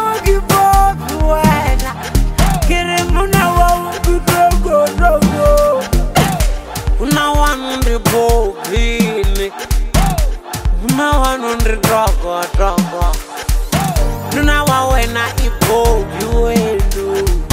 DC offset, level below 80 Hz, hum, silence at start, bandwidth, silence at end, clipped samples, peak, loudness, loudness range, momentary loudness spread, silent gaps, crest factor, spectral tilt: under 0.1%; -16 dBFS; none; 0 s; 16.5 kHz; 0 s; under 0.1%; 0 dBFS; -14 LUFS; 3 LU; 7 LU; none; 12 dB; -5 dB/octave